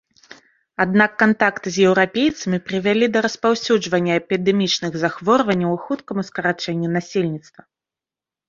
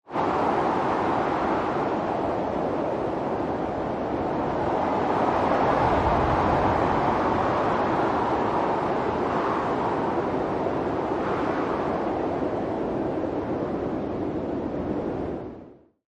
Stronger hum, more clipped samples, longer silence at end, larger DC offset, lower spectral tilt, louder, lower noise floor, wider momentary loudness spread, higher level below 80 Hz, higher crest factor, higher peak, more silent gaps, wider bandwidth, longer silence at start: neither; neither; first, 1.1 s vs 0.45 s; neither; second, -5 dB/octave vs -7.5 dB/octave; first, -19 LUFS vs -25 LUFS; first, -89 dBFS vs -47 dBFS; about the same, 8 LU vs 7 LU; second, -60 dBFS vs -46 dBFS; about the same, 18 dB vs 14 dB; first, 0 dBFS vs -10 dBFS; neither; second, 7.6 kHz vs 9.8 kHz; first, 0.8 s vs 0.1 s